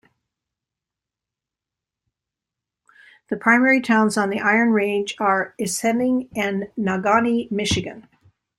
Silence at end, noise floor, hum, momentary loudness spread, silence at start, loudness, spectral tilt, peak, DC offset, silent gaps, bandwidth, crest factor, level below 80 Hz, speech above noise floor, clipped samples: 0.6 s; -87 dBFS; none; 8 LU; 3.3 s; -20 LUFS; -4.5 dB/octave; -2 dBFS; under 0.1%; none; 13.5 kHz; 20 dB; -56 dBFS; 67 dB; under 0.1%